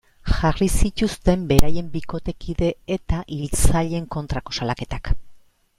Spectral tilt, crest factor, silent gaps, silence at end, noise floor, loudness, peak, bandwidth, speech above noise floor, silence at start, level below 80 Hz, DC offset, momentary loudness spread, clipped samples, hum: -5.5 dB/octave; 18 dB; none; 0.4 s; -46 dBFS; -23 LUFS; 0 dBFS; 16.5 kHz; 27 dB; 0.25 s; -26 dBFS; under 0.1%; 9 LU; under 0.1%; none